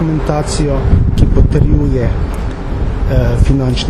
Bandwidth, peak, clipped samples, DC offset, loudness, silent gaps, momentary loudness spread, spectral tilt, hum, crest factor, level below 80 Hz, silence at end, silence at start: 12 kHz; 0 dBFS; under 0.1%; under 0.1%; -14 LUFS; none; 8 LU; -7 dB/octave; none; 10 dB; -14 dBFS; 0 s; 0 s